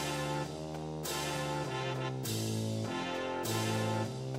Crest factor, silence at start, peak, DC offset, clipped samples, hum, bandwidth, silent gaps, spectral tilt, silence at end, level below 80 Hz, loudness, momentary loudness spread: 14 dB; 0 s; -22 dBFS; under 0.1%; under 0.1%; none; 16 kHz; none; -4.5 dB/octave; 0 s; -60 dBFS; -36 LUFS; 5 LU